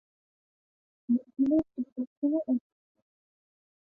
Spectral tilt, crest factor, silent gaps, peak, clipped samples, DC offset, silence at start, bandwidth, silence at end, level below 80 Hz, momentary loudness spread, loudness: -10.5 dB/octave; 16 dB; 1.92-1.96 s, 2.07-2.22 s; -16 dBFS; under 0.1%; under 0.1%; 1.1 s; 2.4 kHz; 1.4 s; -68 dBFS; 10 LU; -30 LUFS